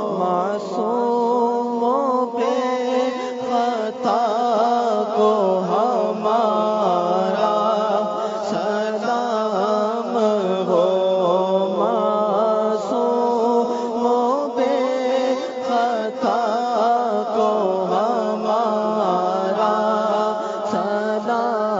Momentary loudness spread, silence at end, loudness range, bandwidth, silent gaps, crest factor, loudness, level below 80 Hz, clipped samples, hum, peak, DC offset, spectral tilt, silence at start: 4 LU; 0 s; 2 LU; 7.8 kHz; none; 14 dB; -20 LUFS; -74 dBFS; under 0.1%; none; -6 dBFS; under 0.1%; -6 dB/octave; 0 s